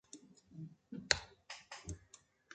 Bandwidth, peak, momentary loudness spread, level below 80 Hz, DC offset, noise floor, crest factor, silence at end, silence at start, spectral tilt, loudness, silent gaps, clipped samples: 9 kHz; -8 dBFS; 23 LU; -62 dBFS; under 0.1%; -66 dBFS; 38 dB; 0 s; 0.15 s; -2 dB/octave; -40 LUFS; none; under 0.1%